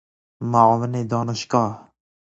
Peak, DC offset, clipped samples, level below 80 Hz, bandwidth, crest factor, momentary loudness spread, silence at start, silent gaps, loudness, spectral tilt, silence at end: 0 dBFS; under 0.1%; under 0.1%; -58 dBFS; 8 kHz; 20 dB; 13 LU; 0.4 s; none; -20 LUFS; -6.5 dB/octave; 0.55 s